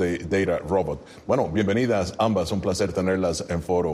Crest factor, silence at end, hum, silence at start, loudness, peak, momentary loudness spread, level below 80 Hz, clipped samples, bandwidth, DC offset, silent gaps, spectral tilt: 16 dB; 0 s; none; 0 s; -24 LUFS; -8 dBFS; 3 LU; -46 dBFS; under 0.1%; 14 kHz; under 0.1%; none; -6 dB/octave